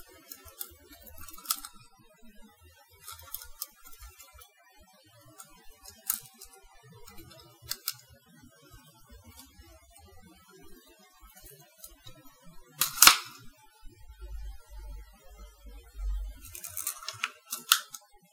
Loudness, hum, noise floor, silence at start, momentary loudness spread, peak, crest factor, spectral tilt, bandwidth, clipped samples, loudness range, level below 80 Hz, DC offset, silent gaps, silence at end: -28 LUFS; none; -60 dBFS; 0 s; 26 LU; 0 dBFS; 36 dB; 1 dB/octave; 18 kHz; under 0.1%; 20 LU; -50 dBFS; under 0.1%; none; 0.35 s